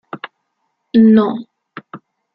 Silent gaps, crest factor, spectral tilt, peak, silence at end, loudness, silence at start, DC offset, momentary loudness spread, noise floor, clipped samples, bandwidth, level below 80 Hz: none; 14 dB; -10.5 dB/octave; -2 dBFS; 0.4 s; -12 LUFS; 0.15 s; under 0.1%; 25 LU; -70 dBFS; under 0.1%; 5 kHz; -60 dBFS